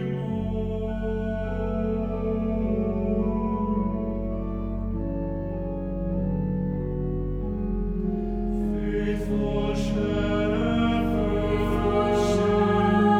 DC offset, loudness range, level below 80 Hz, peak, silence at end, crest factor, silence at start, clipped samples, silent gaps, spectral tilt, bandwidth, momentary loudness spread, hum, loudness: under 0.1%; 5 LU; -34 dBFS; -10 dBFS; 0 s; 14 dB; 0 s; under 0.1%; none; -8 dB/octave; 10.5 kHz; 8 LU; none; -26 LUFS